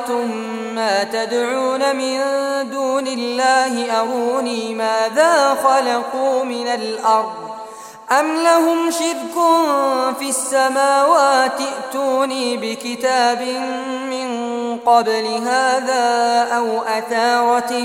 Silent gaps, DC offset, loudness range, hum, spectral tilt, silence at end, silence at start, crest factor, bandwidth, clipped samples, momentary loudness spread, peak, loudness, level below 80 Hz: none; under 0.1%; 3 LU; none; -2 dB/octave; 0 s; 0 s; 16 dB; 16.5 kHz; under 0.1%; 9 LU; -2 dBFS; -17 LUFS; -68 dBFS